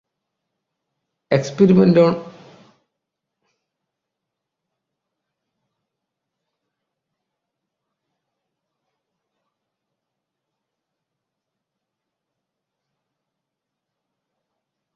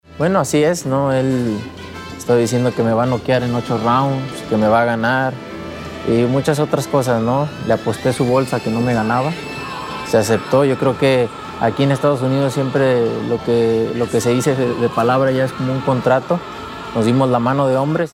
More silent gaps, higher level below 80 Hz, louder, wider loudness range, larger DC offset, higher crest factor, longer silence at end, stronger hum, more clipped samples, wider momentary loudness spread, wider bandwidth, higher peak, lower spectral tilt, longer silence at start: neither; second, -64 dBFS vs -48 dBFS; about the same, -15 LUFS vs -17 LUFS; first, 5 LU vs 2 LU; neither; first, 24 dB vs 16 dB; first, 12.65 s vs 0.05 s; neither; neither; about the same, 9 LU vs 9 LU; second, 7.4 kHz vs 16 kHz; about the same, -2 dBFS vs -2 dBFS; first, -7.5 dB/octave vs -6 dB/octave; first, 1.3 s vs 0.1 s